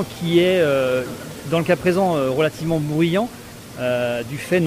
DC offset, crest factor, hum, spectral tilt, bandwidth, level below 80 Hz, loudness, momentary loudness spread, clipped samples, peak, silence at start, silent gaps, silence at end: under 0.1%; 14 dB; none; -6 dB/octave; 16 kHz; -50 dBFS; -20 LUFS; 12 LU; under 0.1%; -6 dBFS; 0 s; none; 0 s